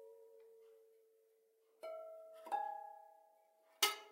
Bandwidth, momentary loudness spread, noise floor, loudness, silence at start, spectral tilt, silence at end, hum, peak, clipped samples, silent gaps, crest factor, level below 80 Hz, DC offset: 16 kHz; 27 LU; -75 dBFS; -42 LUFS; 0 s; 3 dB/octave; 0 s; none; -18 dBFS; under 0.1%; none; 30 dB; under -90 dBFS; under 0.1%